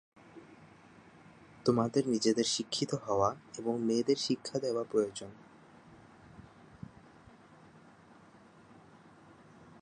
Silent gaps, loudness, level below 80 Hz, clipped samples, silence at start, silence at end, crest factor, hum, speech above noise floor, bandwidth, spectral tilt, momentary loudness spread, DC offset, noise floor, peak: none; -32 LUFS; -70 dBFS; under 0.1%; 0.35 s; 0.2 s; 22 dB; none; 27 dB; 11 kHz; -4.5 dB/octave; 25 LU; under 0.1%; -58 dBFS; -14 dBFS